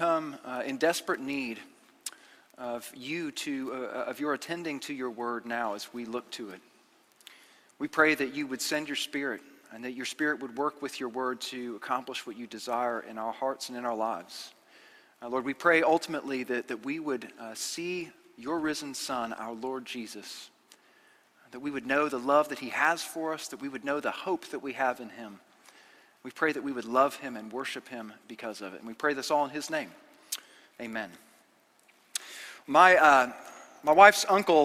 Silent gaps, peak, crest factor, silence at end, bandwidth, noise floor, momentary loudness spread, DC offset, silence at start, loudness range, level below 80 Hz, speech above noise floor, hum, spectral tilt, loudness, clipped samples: none; -4 dBFS; 26 dB; 0 s; 16 kHz; -64 dBFS; 17 LU; under 0.1%; 0 s; 8 LU; -74 dBFS; 35 dB; none; -3 dB/octave; -29 LUFS; under 0.1%